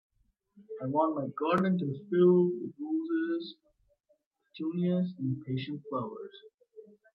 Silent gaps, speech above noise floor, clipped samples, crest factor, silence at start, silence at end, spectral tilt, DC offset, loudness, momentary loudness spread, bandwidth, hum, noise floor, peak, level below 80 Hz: 4.26-4.31 s, 6.54-6.58 s; 44 dB; under 0.1%; 18 dB; 0.6 s; 0.3 s; -9.5 dB/octave; under 0.1%; -31 LUFS; 15 LU; 5.4 kHz; none; -74 dBFS; -14 dBFS; -78 dBFS